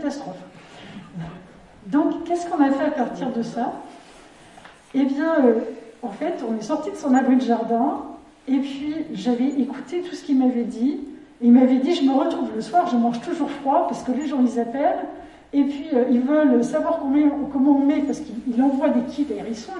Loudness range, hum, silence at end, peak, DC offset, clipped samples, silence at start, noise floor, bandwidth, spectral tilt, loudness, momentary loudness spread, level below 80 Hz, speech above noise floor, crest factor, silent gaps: 5 LU; none; 0 s; -4 dBFS; under 0.1%; under 0.1%; 0 s; -47 dBFS; 10.5 kHz; -6 dB/octave; -21 LUFS; 16 LU; -60 dBFS; 26 dB; 16 dB; none